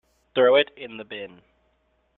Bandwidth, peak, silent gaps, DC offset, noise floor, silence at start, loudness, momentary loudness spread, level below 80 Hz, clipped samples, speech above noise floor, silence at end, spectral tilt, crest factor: 4.2 kHz; -6 dBFS; none; under 0.1%; -68 dBFS; 0.35 s; -21 LUFS; 20 LU; -68 dBFS; under 0.1%; 45 dB; 0.9 s; -6.5 dB/octave; 20 dB